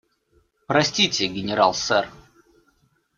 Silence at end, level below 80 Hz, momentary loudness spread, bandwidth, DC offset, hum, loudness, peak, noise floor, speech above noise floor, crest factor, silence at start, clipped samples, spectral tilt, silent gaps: 1 s; -58 dBFS; 5 LU; 7.6 kHz; under 0.1%; none; -21 LUFS; -4 dBFS; -65 dBFS; 43 dB; 22 dB; 0.7 s; under 0.1%; -3 dB/octave; none